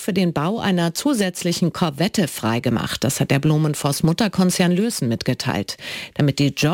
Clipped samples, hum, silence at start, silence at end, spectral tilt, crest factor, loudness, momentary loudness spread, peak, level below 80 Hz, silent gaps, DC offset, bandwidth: under 0.1%; none; 0 s; 0 s; -5 dB/octave; 14 dB; -20 LUFS; 4 LU; -6 dBFS; -52 dBFS; none; under 0.1%; 17 kHz